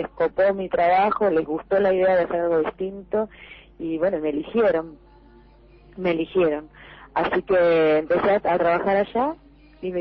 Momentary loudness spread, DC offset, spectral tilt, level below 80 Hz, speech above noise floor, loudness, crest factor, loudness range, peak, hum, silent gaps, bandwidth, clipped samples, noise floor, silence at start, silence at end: 11 LU; under 0.1%; -9 dB/octave; -52 dBFS; 29 dB; -22 LUFS; 12 dB; 5 LU; -10 dBFS; none; none; 5.6 kHz; under 0.1%; -50 dBFS; 0 s; 0 s